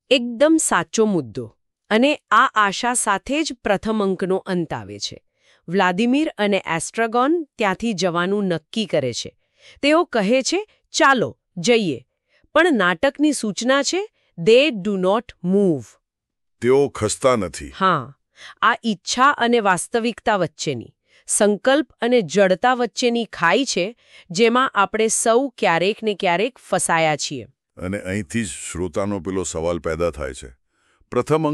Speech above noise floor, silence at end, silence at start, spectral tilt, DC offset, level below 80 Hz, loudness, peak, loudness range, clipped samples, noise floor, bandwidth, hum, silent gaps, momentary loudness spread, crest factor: 59 dB; 0 s; 0.1 s; -4 dB/octave; under 0.1%; -50 dBFS; -19 LUFS; -4 dBFS; 4 LU; under 0.1%; -78 dBFS; 13.5 kHz; none; none; 11 LU; 16 dB